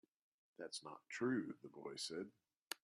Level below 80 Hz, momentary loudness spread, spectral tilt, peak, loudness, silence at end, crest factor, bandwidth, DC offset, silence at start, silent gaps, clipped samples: under -90 dBFS; 12 LU; -4 dB/octave; -26 dBFS; -47 LUFS; 0.1 s; 22 dB; 14 kHz; under 0.1%; 0.6 s; 2.57-2.67 s; under 0.1%